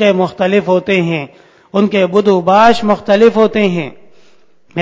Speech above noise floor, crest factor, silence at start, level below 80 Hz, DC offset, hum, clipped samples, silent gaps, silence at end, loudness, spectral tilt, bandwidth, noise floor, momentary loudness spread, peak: 40 dB; 12 dB; 0 s; -50 dBFS; under 0.1%; none; 0.3%; none; 0 s; -12 LUFS; -6.5 dB/octave; 8 kHz; -51 dBFS; 12 LU; 0 dBFS